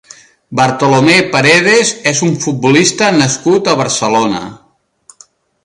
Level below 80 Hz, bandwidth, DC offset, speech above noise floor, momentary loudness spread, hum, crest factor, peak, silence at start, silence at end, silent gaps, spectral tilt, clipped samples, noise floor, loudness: -52 dBFS; 11.5 kHz; under 0.1%; 35 dB; 7 LU; none; 12 dB; 0 dBFS; 0.5 s; 1.1 s; none; -3.5 dB/octave; under 0.1%; -46 dBFS; -10 LUFS